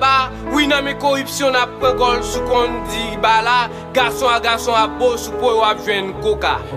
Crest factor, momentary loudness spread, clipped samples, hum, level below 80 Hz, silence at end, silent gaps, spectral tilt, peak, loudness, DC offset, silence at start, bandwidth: 16 dB; 5 LU; under 0.1%; none; -36 dBFS; 0 s; none; -3.5 dB/octave; -2 dBFS; -16 LUFS; under 0.1%; 0 s; 15.5 kHz